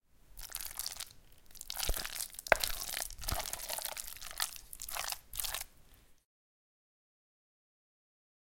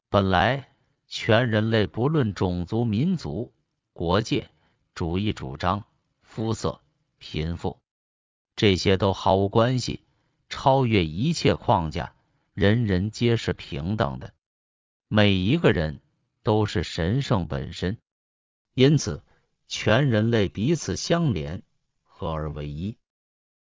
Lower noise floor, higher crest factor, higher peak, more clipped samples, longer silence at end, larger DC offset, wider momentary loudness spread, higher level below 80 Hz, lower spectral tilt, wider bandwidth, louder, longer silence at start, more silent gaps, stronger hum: about the same, -61 dBFS vs -64 dBFS; first, 36 dB vs 20 dB; about the same, -6 dBFS vs -4 dBFS; neither; first, 2.35 s vs 0.7 s; neither; about the same, 15 LU vs 14 LU; second, -52 dBFS vs -42 dBFS; second, -0.5 dB/octave vs -6 dB/octave; first, 17 kHz vs 7.6 kHz; second, -38 LUFS vs -24 LUFS; about the same, 0.15 s vs 0.1 s; second, none vs 7.91-8.45 s, 14.46-15.00 s, 18.11-18.65 s; neither